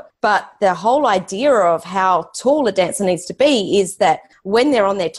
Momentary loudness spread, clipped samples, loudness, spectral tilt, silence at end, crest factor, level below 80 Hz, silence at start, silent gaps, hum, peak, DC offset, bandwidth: 4 LU; under 0.1%; -16 LUFS; -4 dB/octave; 0 s; 12 dB; -56 dBFS; 0.25 s; none; none; -4 dBFS; under 0.1%; 12.5 kHz